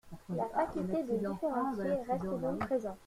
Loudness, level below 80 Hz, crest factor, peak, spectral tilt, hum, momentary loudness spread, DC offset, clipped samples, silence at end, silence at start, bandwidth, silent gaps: -35 LUFS; -60 dBFS; 16 dB; -20 dBFS; -8 dB/octave; none; 2 LU; under 0.1%; under 0.1%; 0 s; 0.05 s; 15.5 kHz; none